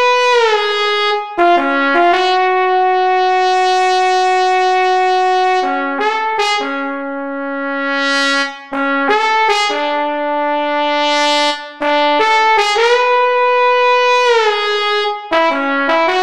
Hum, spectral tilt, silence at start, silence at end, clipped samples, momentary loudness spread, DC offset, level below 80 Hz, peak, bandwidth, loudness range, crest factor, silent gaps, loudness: none; -1 dB/octave; 0 s; 0 s; under 0.1%; 6 LU; 0.9%; -58 dBFS; -2 dBFS; 12 kHz; 4 LU; 12 dB; none; -13 LUFS